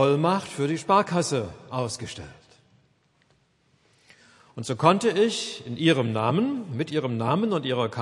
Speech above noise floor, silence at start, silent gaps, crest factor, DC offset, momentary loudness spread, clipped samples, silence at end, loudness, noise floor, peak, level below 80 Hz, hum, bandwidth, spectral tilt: 41 dB; 0 s; none; 22 dB; under 0.1%; 12 LU; under 0.1%; 0 s; -25 LUFS; -65 dBFS; -4 dBFS; -66 dBFS; none; 11.5 kHz; -5.5 dB/octave